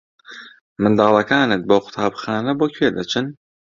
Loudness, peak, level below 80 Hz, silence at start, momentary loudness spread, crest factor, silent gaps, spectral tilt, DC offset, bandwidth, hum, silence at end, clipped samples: -18 LUFS; -2 dBFS; -56 dBFS; 0.3 s; 15 LU; 18 dB; 0.61-0.76 s; -6 dB/octave; under 0.1%; 7.4 kHz; none; 0.35 s; under 0.1%